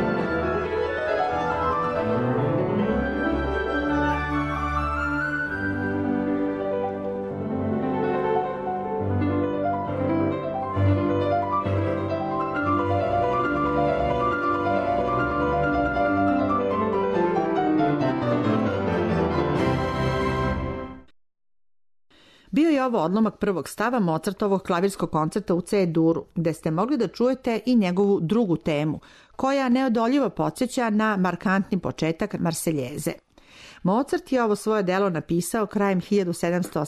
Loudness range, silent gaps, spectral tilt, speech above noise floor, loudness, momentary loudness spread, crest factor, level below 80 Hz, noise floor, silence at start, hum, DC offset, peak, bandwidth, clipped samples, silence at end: 3 LU; none; -6.5 dB/octave; 25 dB; -24 LUFS; 5 LU; 12 dB; -42 dBFS; -48 dBFS; 0 s; none; under 0.1%; -12 dBFS; 13.5 kHz; under 0.1%; 0 s